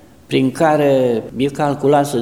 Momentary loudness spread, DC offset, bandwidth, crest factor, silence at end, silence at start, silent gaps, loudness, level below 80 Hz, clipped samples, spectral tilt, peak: 6 LU; 0.3%; 16 kHz; 14 dB; 0 s; 0.3 s; none; -16 LUFS; -52 dBFS; under 0.1%; -6.5 dB/octave; -2 dBFS